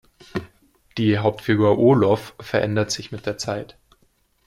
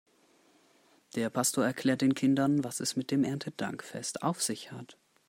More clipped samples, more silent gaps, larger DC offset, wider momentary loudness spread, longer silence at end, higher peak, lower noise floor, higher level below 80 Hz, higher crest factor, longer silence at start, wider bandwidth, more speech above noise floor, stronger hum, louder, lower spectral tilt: neither; neither; neither; first, 17 LU vs 11 LU; first, 0.8 s vs 0.35 s; first, -4 dBFS vs -14 dBFS; about the same, -63 dBFS vs -66 dBFS; first, -54 dBFS vs -76 dBFS; about the same, 18 dB vs 16 dB; second, 0.35 s vs 1.15 s; second, 14 kHz vs 16 kHz; first, 43 dB vs 35 dB; neither; first, -21 LUFS vs -31 LUFS; first, -6 dB/octave vs -4.5 dB/octave